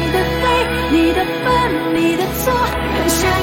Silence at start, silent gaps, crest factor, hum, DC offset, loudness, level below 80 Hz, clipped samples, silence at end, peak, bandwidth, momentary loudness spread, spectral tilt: 0 s; none; 12 dB; none; under 0.1%; -16 LUFS; -28 dBFS; under 0.1%; 0 s; -2 dBFS; 17 kHz; 3 LU; -4.5 dB/octave